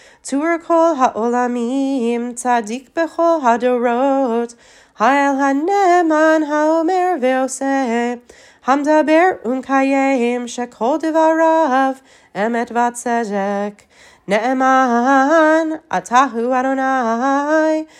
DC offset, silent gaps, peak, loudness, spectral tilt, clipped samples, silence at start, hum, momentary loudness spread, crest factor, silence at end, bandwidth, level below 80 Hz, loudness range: under 0.1%; none; 0 dBFS; -16 LUFS; -4.5 dB/octave; under 0.1%; 0.25 s; none; 8 LU; 14 dB; 0.15 s; 12.5 kHz; -66 dBFS; 3 LU